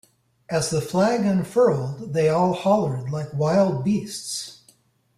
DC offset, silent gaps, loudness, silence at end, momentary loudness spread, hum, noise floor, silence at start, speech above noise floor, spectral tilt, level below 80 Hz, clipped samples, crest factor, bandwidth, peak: under 0.1%; none; -22 LUFS; 0.65 s; 9 LU; none; -59 dBFS; 0.5 s; 38 dB; -6 dB/octave; -58 dBFS; under 0.1%; 14 dB; 15 kHz; -8 dBFS